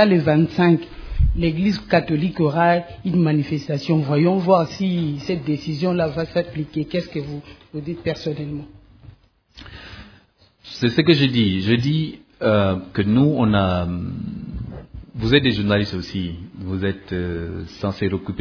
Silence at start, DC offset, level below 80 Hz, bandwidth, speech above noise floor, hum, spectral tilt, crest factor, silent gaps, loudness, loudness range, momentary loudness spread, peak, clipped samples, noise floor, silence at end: 0 s; under 0.1%; -36 dBFS; 5.4 kHz; 35 dB; none; -7.5 dB/octave; 18 dB; none; -20 LUFS; 9 LU; 16 LU; -2 dBFS; under 0.1%; -55 dBFS; 0 s